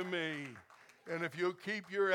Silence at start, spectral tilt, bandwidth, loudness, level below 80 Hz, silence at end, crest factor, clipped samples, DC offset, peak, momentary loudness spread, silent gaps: 0 s; -5 dB/octave; 15.5 kHz; -39 LUFS; -88 dBFS; 0 s; 20 dB; under 0.1%; under 0.1%; -18 dBFS; 16 LU; none